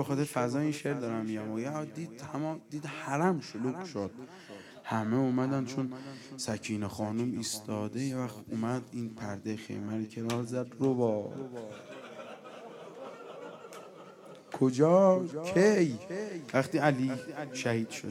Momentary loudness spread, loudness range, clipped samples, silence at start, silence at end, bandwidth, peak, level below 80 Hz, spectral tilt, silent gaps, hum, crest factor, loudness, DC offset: 20 LU; 8 LU; under 0.1%; 0 s; 0 s; 16 kHz; -10 dBFS; -76 dBFS; -6 dB/octave; none; none; 22 dB; -32 LUFS; under 0.1%